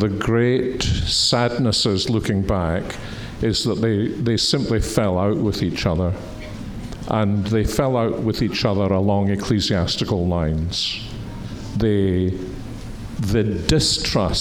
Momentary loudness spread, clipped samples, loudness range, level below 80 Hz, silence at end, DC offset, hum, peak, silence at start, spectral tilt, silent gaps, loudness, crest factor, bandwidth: 14 LU; under 0.1%; 2 LU; -36 dBFS; 0 s; 0.1%; none; -2 dBFS; 0 s; -5 dB/octave; none; -20 LUFS; 18 dB; 18 kHz